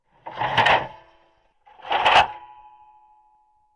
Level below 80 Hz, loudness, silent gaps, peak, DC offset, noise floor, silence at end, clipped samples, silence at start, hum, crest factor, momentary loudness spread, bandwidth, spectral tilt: -54 dBFS; -19 LUFS; none; -6 dBFS; under 0.1%; -61 dBFS; 1.3 s; under 0.1%; 0.25 s; none; 20 dB; 23 LU; 11.5 kHz; -3 dB/octave